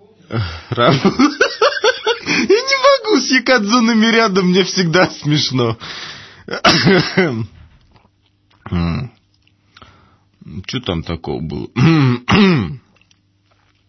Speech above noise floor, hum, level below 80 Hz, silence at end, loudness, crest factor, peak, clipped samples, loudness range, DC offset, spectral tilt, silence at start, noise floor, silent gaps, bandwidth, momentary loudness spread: 44 dB; none; -42 dBFS; 1.1 s; -14 LUFS; 16 dB; 0 dBFS; under 0.1%; 12 LU; under 0.1%; -5 dB/octave; 0.3 s; -58 dBFS; none; 6.4 kHz; 14 LU